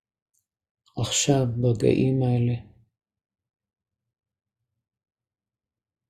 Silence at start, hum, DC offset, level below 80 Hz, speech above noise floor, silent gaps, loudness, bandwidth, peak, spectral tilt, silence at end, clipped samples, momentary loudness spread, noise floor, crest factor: 0.95 s; none; under 0.1%; -54 dBFS; over 68 dB; none; -23 LUFS; 13.5 kHz; -8 dBFS; -5.5 dB/octave; 3.5 s; under 0.1%; 11 LU; under -90 dBFS; 20 dB